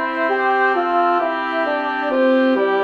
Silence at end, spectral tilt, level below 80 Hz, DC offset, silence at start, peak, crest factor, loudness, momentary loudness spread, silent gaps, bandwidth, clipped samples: 0 s; -5 dB/octave; -60 dBFS; under 0.1%; 0 s; -6 dBFS; 12 dB; -17 LUFS; 5 LU; none; 6.6 kHz; under 0.1%